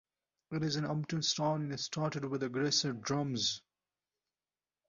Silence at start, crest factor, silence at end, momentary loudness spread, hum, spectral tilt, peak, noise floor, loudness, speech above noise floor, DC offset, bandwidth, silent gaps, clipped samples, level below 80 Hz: 0.5 s; 18 dB; 1.3 s; 6 LU; none; -4 dB/octave; -18 dBFS; under -90 dBFS; -34 LUFS; over 55 dB; under 0.1%; 7.2 kHz; none; under 0.1%; -72 dBFS